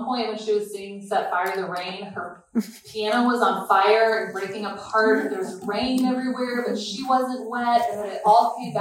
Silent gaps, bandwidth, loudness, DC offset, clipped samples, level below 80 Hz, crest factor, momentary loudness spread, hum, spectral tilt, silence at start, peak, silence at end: none; 16.5 kHz; -23 LUFS; under 0.1%; under 0.1%; -64 dBFS; 18 dB; 12 LU; none; -4.5 dB/octave; 0 s; -4 dBFS; 0 s